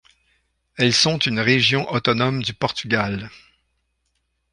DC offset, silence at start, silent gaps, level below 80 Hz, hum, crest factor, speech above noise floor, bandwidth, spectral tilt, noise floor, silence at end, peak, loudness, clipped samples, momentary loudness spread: under 0.1%; 0.75 s; none; -54 dBFS; none; 20 dB; 51 dB; 11 kHz; -4 dB/octave; -71 dBFS; 1.15 s; -4 dBFS; -19 LUFS; under 0.1%; 11 LU